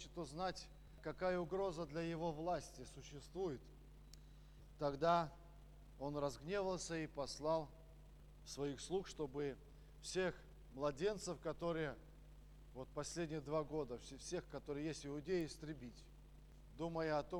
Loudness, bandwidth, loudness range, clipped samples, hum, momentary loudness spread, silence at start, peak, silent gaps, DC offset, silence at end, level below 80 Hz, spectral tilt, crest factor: -45 LUFS; over 20 kHz; 4 LU; under 0.1%; none; 22 LU; 0 s; -24 dBFS; none; under 0.1%; 0 s; -62 dBFS; -5 dB/octave; 22 dB